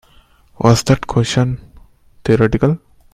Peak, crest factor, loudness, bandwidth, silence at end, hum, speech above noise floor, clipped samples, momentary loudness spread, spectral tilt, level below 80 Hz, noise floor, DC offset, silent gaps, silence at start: 0 dBFS; 16 dB; -16 LUFS; 14 kHz; 0.35 s; none; 36 dB; under 0.1%; 11 LU; -6 dB/octave; -36 dBFS; -49 dBFS; under 0.1%; none; 0.6 s